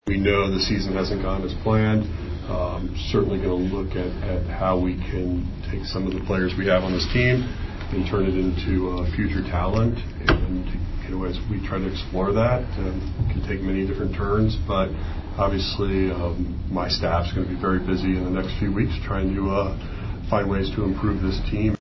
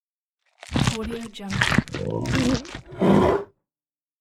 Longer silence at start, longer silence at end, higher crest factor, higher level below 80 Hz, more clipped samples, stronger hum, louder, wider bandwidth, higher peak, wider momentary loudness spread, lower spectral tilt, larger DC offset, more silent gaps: second, 0.05 s vs 0.65 s; second, 0.05 s vs 0.75 s; about the same, 20 dB vs 22 dB; first, -30 dBFS vs -40 dBFS; neither; neither; about the same, -24 LUFS vs -23 LUFS; second, 6.2 kHz vs 15 kHz; about the same, -4 dBFS vs -2 dBFS; second, 8 LU vs 13 LU; first, -7.5 dB/octave vs -5.5 dB/octave; neither; neither